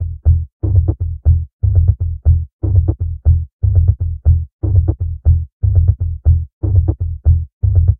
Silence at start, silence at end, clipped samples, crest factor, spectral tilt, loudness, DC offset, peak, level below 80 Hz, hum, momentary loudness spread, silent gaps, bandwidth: 0 s; 0.05 s; under 0.1%; 14 dB; -17 dB/octave; -16 LUFS; under 0.1%; 0 dBFS; -18 dBFS; none; 4 LU; 0.52-0.60 s, 1.53-1.59 s, 2.53-2.59 s, 3.53-3.59 s, 4.52-4.59 s, 5.53-5.60 s, 6.53-6.61 s, 7.52-7.61 s; 1.2 kHz